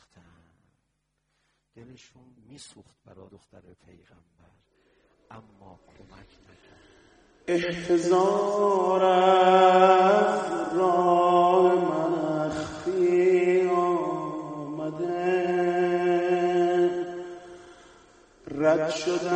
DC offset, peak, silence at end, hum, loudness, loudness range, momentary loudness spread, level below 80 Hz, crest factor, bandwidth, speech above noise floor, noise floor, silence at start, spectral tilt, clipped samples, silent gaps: under 0.1%; -6 dBFS; 0 s; none; -23 LUFS; 7 LU; 15 LU; -64 dBFS; 20 dB; 9.4 kHz; 51 dB; -76 dBFS; 1.75 s; -6 dB/octave; under 0.1%; none